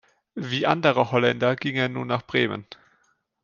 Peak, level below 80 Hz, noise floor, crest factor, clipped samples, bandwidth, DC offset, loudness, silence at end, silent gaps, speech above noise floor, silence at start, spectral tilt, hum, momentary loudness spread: -2 dBFS; -64 dBFS; -67 dBFS; 22 dB; under 0.1%; 7.2 kHz; under 0.1%; -23 LUFS; 0.7 s; none; 44 dB; 0.35 s; -6.5 dB/octave; none; 12 LU